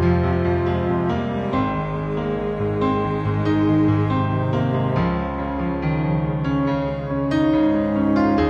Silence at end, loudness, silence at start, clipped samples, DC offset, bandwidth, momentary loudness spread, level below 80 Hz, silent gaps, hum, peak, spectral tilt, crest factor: 0 s; -21 LUFS; 0 s; under 0.1%; under 0.1%; 7 kHz; 6 LU; -36 dBFS; none; none; -6 dBFS; -9.5 dB/octave; 14 dB